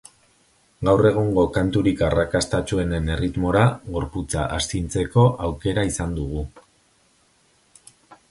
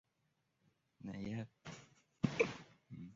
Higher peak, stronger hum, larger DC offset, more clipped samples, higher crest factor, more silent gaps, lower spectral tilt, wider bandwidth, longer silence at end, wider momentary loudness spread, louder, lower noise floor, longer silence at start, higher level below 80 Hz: first, -2 dBFS vs -20 dBFS; neither; neither; neither; second, 20 dB vs 26 dB; neither; about the same, -6 dB/octave vs -5.5 dB/octave; first, 11.5 kHz vs 7.6 kHz; first, 0.15 s vs 0 s; second, 10 LU vs 18 LU; first, -22 LUFS vs -42 LUFS; second, -61 dBFS vs -83 dBFS; second, 0.8 s vs 1 s; first, -36 dBFS vs -72 dBFS